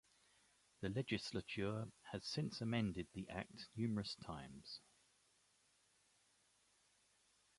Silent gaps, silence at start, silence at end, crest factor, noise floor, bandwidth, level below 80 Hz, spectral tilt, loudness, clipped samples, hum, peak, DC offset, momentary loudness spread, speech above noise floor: none; 0.8 s; 2.8 s; 22 dB; -77 dBFS; 11.5 kHz; -70 dBFS; -5.5 dB/octave; -46 LUFS; under 0.1%; none; -26 dBFS; under 0.1%; 11 LU; 32 dB